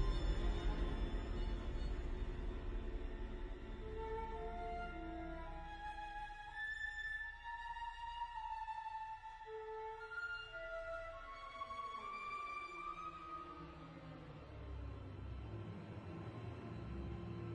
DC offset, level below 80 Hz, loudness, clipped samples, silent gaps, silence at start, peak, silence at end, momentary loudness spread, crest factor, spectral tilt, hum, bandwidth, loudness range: under 0.1%; -48 dBFS; -47 LUFS; under 0.1%; none; 0 s; -26 dBFS; 0 s; 8 LU; 20 dB; -6.5 dB/octave; none; 9.4 kHz; 4 LU